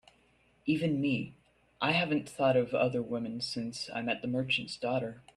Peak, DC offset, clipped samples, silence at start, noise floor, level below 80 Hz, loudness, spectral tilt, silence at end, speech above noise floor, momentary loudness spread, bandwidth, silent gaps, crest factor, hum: -14 dBFS; under 0.1%; under 0.1%; 0.65 s; -67 dBFS; -68 dBFS; -32 LUFS; -5.5 dB/octave; 0.15 s; 36 dB; 8 LU; 12.5 kHz; none; 18 dB; none